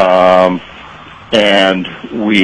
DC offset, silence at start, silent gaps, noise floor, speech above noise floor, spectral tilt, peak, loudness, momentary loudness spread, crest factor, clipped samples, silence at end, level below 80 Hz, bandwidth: under 0.1%; 0 s; none; -33 dBFS; 22 dB; -5 dB/octave; 0 dBFS; -10 LUFS; 16 LU; 12 dB; under 0.1%; 0 s; -46 dBFS; 10.5 kHz